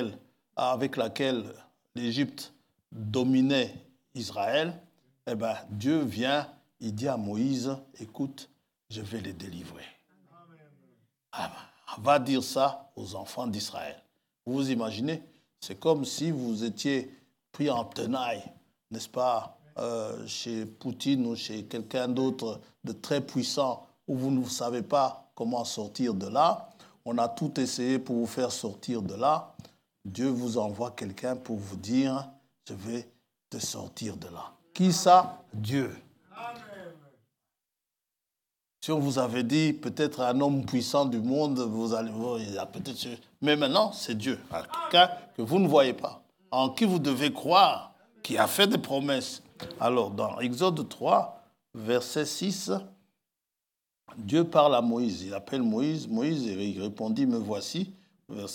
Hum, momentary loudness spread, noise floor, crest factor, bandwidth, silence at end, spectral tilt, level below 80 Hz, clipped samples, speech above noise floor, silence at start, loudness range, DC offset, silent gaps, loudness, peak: none; 18 LU; -88 dBFS; 24 dB; 18 kHz; 0 s; -5 dB/octave; -76 dBFS; under 0.1%; 59 dB; 0 s; 8 LU; under 0.1%; none; -29 LUFS; -6 dBFS